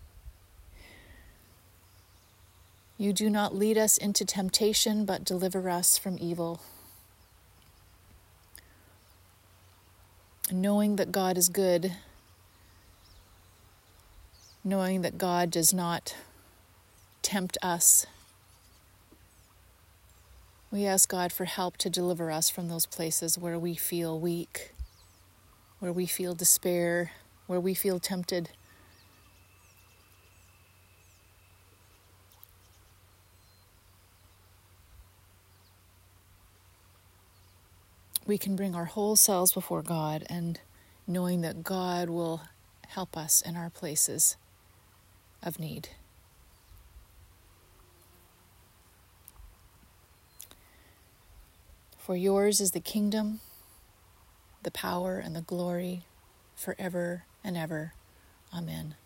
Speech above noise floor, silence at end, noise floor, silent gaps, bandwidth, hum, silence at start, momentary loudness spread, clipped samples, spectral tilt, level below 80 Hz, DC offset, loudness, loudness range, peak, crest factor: 31 dB; 0.1 s; -60 dBFS; none; 16.5 kHz; none; 0 s; 17 LU; under 0.1%; -3.5 dB/octave; -62 dBFS; under 0.1%; -28 LUFS; 10 LU; -6 dBFS; 28 dB